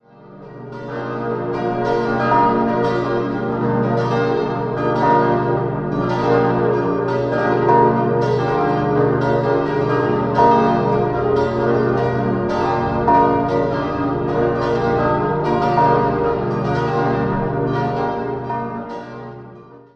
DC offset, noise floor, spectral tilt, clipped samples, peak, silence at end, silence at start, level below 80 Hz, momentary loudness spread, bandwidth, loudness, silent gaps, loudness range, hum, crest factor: under 0.1%; -40 dBFS; -8.5 dB/octave; under 0.1%; -2 dBFS; 0.15 s; 0.2 s; -42 dBFS; 9 LU; 7.6 kHz; -18 LUFS; none; 3 LU; none; 16 dB